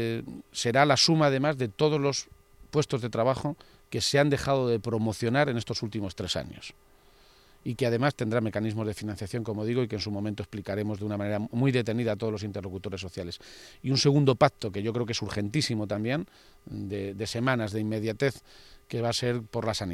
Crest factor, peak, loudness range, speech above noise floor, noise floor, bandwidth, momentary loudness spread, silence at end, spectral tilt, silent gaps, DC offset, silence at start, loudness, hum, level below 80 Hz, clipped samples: 22 dB; -6 dBFS; 5 LU; 30 dB; -58 dBFS; 15 kHz; 14 LU; 0 s; -5 dB/octave; none; under 0.1%; 0 s; -28 LUFS; none; -56 dBFS; under 0.1%